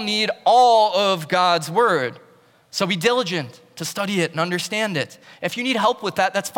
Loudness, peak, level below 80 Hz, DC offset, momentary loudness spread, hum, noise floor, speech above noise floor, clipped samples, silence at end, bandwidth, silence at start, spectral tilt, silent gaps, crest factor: -20 LUFS; -6 dBFS; -72 dBFS; under 0.1%; 14 LU; none; -51 dBFS; 32 dB; under 0.1%; 0 s; 18 kHz; 0 s; -3.5 dB/octave; none; 14 dB